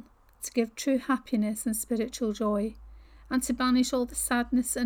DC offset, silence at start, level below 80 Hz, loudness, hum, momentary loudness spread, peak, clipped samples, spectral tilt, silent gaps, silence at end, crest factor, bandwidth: under 0.1%; 0.4 s; -52 dBFS; -29 LUFS; none; 6 LU; -14 dBFS; under 0.1%; -3.5 dB/octave; none; 0 s; 14 dB; 19 kHz